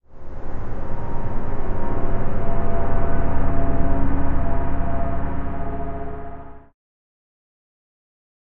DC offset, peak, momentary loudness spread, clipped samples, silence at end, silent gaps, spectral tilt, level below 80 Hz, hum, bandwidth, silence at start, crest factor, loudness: under 0.1%; -4 dBFS; 11 LU; under 0.1%; 2 s; none; -9 dB/octave; -24 dBFS; none; 2.6 kHz; 0.1 s; 14 dB; -27 LUFS